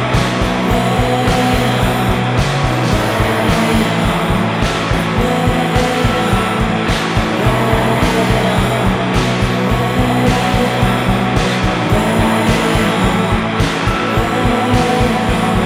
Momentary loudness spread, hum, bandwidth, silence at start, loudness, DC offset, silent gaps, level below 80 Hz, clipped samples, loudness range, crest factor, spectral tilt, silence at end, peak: 2 LU; none; 16 kHz; 0 s; -14 LUFS; under 0.1%; none; -24 dBFS; under 0.1%; 1 LU; 14 dB; -5.5 dB/octave; 0 s; 0 dBFS